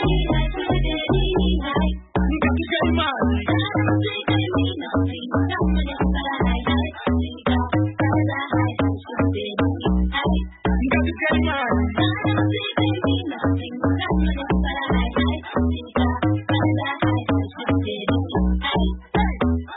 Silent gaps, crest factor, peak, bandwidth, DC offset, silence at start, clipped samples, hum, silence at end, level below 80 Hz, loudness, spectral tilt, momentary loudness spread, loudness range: none; 14 dB; -6 dBFS; 4 kHz; under 0.1%; 0 s; under 0.1%; none; 0 s; -28 dBFS; -22 LUFS; -11.5 dB/octave; 3 LU; 1 LU